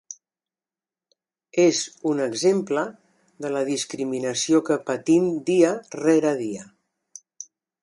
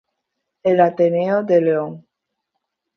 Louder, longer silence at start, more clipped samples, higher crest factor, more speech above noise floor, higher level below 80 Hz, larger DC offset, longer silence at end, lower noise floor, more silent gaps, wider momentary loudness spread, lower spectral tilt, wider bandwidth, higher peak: second, -23 LUFS vs -17 LUFS; second, 0.1 s vs 0.65 s; neither; about the same, 20 dB vs 18 dB; first, over 68 dB vs 61 dB; about the same, -72 dBFS vs -68 dBFS; neither; second, 0.4 s vs 1 s; first, under -90 dBFS vs -77 dBFS; neither; first, 18 LU vs 8 LU; second, -4.5 dB/octave vs -9 dB/octave; first, 11.5 kHz vs 6.4 kHz; about the same, -4 dBFS vs -2 dBFS